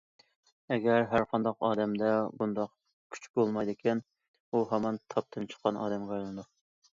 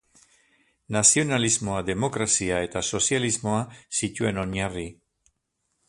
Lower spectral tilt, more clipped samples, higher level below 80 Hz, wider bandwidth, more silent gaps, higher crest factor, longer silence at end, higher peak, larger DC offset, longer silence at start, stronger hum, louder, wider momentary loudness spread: first, -7 dB/octave vs -3 dB/octave; neither; second, -68 dBFS vs -50 dBFS; second, 7.6 kHz vs 11.5 kHz; first, 2.93-3.10 s, 3.30-3.34 s, 4.28-4.34 s, 4.40-4.52 s vs none; about the same, 20 dB vs 22 dB; second, 0.5 s vs 0.95 s; second, -12 dBFS vs -4 dBFS; neither; second, 0.7 s vs 0.9 s; neither; second, -32 LUFS vs -24 LUFS; about the same, 11 LU vs 11 LU